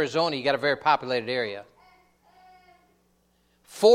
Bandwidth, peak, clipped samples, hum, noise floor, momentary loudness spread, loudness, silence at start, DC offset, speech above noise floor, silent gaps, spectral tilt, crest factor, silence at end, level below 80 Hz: 15.5 kHz; -6 dBFS; under 0.1%; none; -67 dBFS; 13 LU; -25 LUFS; 0 s; under 0.1%; 41 dB; none; -4 dB/octave; 20 dB; 0 s; -70 dBFS